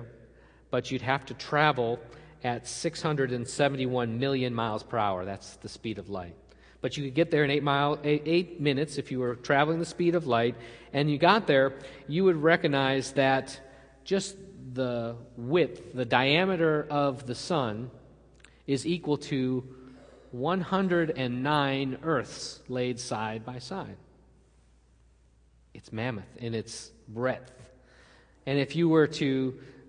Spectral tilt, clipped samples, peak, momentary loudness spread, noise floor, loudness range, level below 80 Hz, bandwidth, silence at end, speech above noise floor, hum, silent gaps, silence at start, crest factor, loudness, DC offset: -5.5 dB/octave; under 0.1%; -6 dBFS; 15 LU; -61 dBFS; 12 LU; -60 dBFS; 10.5 kHz; 0.15 s; 33 dB; none; none; 0 s; 24 dB; -28 LUFS; under 0.1%